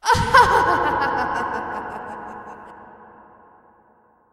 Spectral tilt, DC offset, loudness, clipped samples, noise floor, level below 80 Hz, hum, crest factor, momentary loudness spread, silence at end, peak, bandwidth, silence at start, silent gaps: -4 dB/octave; under 0.1%; -18 LUFS; under 0.1%; -57 dBFS; -42 dBFS; none; 22 dB; 23 LU; 1.3 s; 0 dBFS; 15.5 kHz; 0.05 s; none